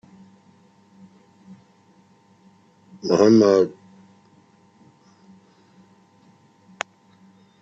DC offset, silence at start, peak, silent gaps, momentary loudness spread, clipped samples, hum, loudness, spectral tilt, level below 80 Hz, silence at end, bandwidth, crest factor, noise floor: under 0.1%; 3.05 s; -4 dBFS; none; 20 LU; under 0.1%; none; -19 LUFS; -6 dB/octave; -72 dBFS; 3.95 s; 8 kHz; 22 dB; -56 dBFS